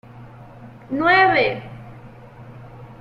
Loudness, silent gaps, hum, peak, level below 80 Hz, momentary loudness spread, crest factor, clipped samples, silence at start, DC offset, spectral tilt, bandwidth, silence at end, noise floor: -17 LUFS; none; none; -4 dBFS; -52 dBFS; 27 LU; 18 dB; under 0.1%; 0.15 s; under 0.1%; -7 dB/octave; 7.2 kHz; 0.05 s; -41 dBFS